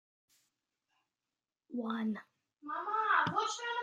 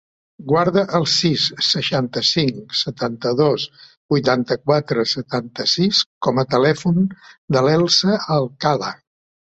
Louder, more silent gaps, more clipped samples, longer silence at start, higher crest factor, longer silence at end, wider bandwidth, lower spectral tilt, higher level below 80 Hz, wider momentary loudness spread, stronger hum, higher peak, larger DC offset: second, -35 LUFS vs -18 LUFS; second, none vs 3.97-4.09 s, 6.06-6.21 s, 7.38-7.48 s; neither; first, 1.7 s vs 0.4 s; about the same, 20 dB vs 18 dB; second, 0 s vs 0.6 s; first, 9.6 kHz vs 8.2 kHz; second, -3.5 dB/octave vs -5 dB/octave; second, -84 dBFS vs -56 dBFS; first, 15 LU vs 8 LU; neither; second, -18 dBFS vs -2 dBFS; neither